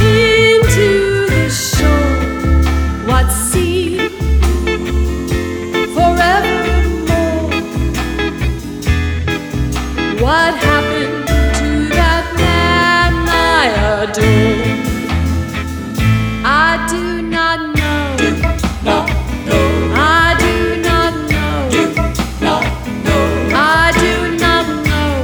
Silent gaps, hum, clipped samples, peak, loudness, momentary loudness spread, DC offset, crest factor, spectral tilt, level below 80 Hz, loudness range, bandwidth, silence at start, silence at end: none; none; under 0.1%; 0 dBFS; -13 LUFS; 8 LU; under 0.1%; 12 dB; -5 dB/octave; -20 dBFS; 3 LU; over 20 kHz; 0 s; 0 s